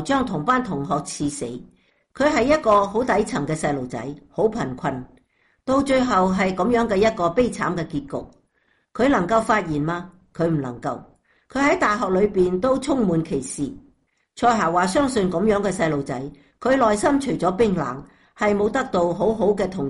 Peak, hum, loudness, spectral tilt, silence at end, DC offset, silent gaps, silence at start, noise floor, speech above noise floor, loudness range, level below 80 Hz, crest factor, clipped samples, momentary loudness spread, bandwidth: -6 dBFS; none; -21 LUFS; -5.5 dB/octave; 0 s; under 0.1%; none; 0 s; -66 dBFS; 45 dB; 3 LU; -46 dBFS; 16 dB; under 0.1%; 12 LU; 11.5 kHz